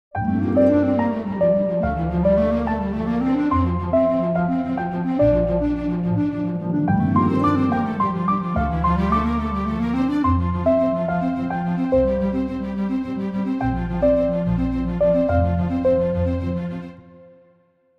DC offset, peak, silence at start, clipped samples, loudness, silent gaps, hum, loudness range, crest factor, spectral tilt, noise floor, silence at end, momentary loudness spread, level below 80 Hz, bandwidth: under 0.1%; -6 dBFS; 0.15 s; under 0.1%; -21 LUFS; none; none; 2 LU; 14 dB; -10 dB/octave; -59 dBFS; 0.75 s; 6 LU; -34 dBFS; 6.2 kHz